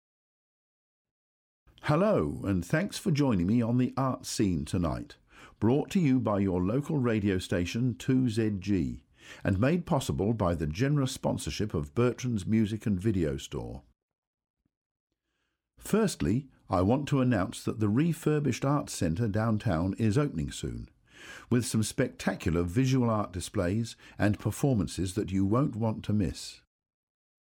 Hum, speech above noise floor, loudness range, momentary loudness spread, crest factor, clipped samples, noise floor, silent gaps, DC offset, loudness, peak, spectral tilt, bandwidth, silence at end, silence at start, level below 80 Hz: none; 53 dB; 4 LU; 7 LU; 16 dB; under 0.1%; -81 dBFS; 14.03-14.09 s, 14.18-14.33 s, 14.50-14.54 s, 14.77-15.07 s; under 0.1%; -29 LUFS; -14 dBFS; -6.5 dB/octave; 17 kHz; 0.9 s; 1.85 s; -50 dBFS